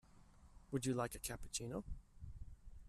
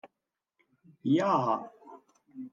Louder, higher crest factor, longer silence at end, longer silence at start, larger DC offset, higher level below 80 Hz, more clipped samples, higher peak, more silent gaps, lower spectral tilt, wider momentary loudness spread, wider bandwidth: second, -44 LUFS vs -29 LUFS; about the same, 20 dB vs 18 dB; about the same, 0 s vs 0.05 s; about the same, 0.05 s vs 0.05 s; neither; first, -56 dBFS vs -86 dBFS; neither; second, -28 dBFS vs -16 dBFS; neither; second, -4.5 dB/octave vs -7.5 dB/octave; second, 17 LU vs 21 LU; first, 14.5 kHz vs 7.2 kHz